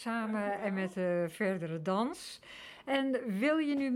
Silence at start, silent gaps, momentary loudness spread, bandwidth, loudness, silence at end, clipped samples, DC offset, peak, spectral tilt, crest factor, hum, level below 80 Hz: 0 s; none; 14 LU; 15.5 kHz; -33 LUFS; 0 s; under 0.1%; under 0.1%; -18 dBFS; -6 dB/octave; 16 dB; none; -74 dBFS